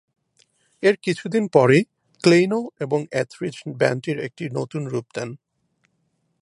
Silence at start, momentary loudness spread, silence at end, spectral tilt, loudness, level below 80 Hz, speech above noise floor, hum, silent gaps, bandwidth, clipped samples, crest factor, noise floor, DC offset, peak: 0.8 s; 14 LU; 1.05 s; -6 dB/octave; -21 LUFS; -68 dBFS; 49 dB; none; none; 11 kHz; under 0.1%; 22 dB; -70 dBFS; under 0.1%; -2 dBFS